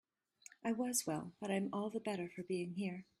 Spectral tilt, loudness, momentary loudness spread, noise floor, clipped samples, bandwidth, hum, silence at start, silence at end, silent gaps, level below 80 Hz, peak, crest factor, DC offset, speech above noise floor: -4.5 dB/octave; -41 LUFS; 8 LU; -64 dBFS; under 0.1%; 15 kHz; none; 0.65 s; 0.15 s; none; -82 dBFS; -22 dBFS; 20 dB; under 0.1%; 23 dB